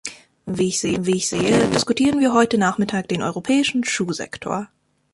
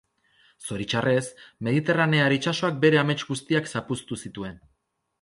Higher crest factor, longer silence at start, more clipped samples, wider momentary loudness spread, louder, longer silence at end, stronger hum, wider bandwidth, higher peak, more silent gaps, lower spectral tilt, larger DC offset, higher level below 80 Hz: about the same, 18 dB vs 20 dB; second, 0.05 s vs 0.6 s; neither; second, 11 LU vs 16 LU; first, -20 LUFS vs -24 LUFS; second, 0.5 s vs 0.65 s; neither; about the same, 11.5 kHz vs 11.5 kHz; about the same, -4 dBFS vs -6 dBFS; neither; about the same, -4.5 dB/octave vs -5.5 dB/octave; neither; first, -52 dBFS vs -60 dBFS